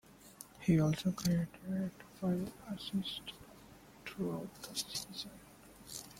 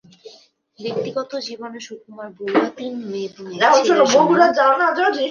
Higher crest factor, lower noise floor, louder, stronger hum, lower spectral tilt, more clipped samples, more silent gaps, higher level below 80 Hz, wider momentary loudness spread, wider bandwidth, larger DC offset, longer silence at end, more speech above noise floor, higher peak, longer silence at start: about the same, 20 dB vs 18 dB; first, -58 dBFS vs -51 dBFS; second, -38 LUFS vs -17 LUFS; neither; first, -5.5 dB/octave vs -3.5 dB/octave; neither; neither; first, -64 dBFS vs -70 dBFS; first, 23 LU vs 19 LU; first, 16.5 kHz vs 7.2 kHz; neither; about the same, 0 s vs 0 s; second, 21 dB vs 33 dB; second, -18 dBFS vs -2 dBFS; second, 0.1 s vs 0.25 s